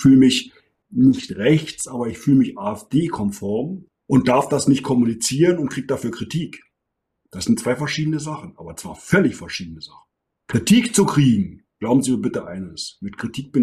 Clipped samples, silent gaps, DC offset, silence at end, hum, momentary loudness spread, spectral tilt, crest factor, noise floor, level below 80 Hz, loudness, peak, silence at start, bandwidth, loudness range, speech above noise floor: under 0.1%; none; under 0.1%; 0 s; none; 16 LU; -5.5 dB/octave; 16 dB; -78 dBFS; -52 dBFS; -20 LUFS; -4 dBFS; 0 s; 14 kHz; 4 LU; 59 dB